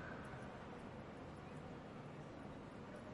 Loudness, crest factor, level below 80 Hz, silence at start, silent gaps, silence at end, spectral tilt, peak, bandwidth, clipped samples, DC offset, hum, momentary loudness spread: -53 LUFS; 14 dB; -68 dBFS; 0 s; none; 0 s; -6.5 dB/octave; -38 dBFS; 11 kHz; under 0.1%; under 0.1%; none; 2 LU